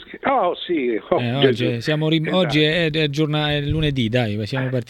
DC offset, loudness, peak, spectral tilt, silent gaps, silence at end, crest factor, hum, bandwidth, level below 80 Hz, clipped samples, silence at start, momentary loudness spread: under 0.1%; -20 LUFS; -2 dBFS; -6.5 dB/octave; none; 0.05 s; 18 dB; none; 12.5 kHz; -42 dBFS; under 0.1%; 0 s; 5 LU